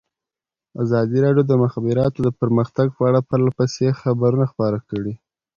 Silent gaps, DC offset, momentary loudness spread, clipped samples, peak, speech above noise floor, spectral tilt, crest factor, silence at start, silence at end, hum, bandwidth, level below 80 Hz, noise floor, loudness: none; under 0.1%; 10 LU; under 0.1%; -4 dBFS; 71 dB; -8.5 dB/octave; 16 dB; 0.75 s; 0.4 s; none; 7.2 kHz; -52 dBFS; -89 dBFS; -19 LUFS